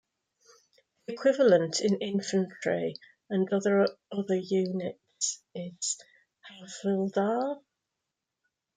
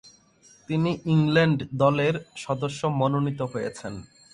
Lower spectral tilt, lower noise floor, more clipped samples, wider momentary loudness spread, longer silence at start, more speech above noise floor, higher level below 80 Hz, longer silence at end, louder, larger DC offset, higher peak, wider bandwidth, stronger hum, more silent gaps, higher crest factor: second, -4.5 dB/octave vs -7 dB/octave; first, -86 dBFS vs -57 dBFS; neither; first, 16 LU vs 12 LU; first, 1.1 s vs 0.05 s; first, 58 dB vs 32 dB; second, -78 dBFS vs -58 dBFS; first, 1.2 s vs 0.3 s; second, -29 LUFS vs -25 LUFS; neither; second, -10 dBFS vs -6 dBFS; second, 9.6 kHz vs 11 kHz; neither; neither; about the same, 20 dB vs 18 dB